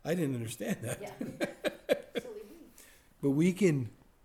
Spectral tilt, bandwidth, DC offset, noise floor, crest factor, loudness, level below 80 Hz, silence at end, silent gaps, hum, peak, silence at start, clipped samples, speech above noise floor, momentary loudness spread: -6 dB/octave; 17 kHz; under 0.1%; -58 dBFS; 20 dB; -33 LUFS; -66 dBFS; 0.3 s; none; none; -14 dBFS; 0.05 s; under 0.1%; 27 dB; 17 LU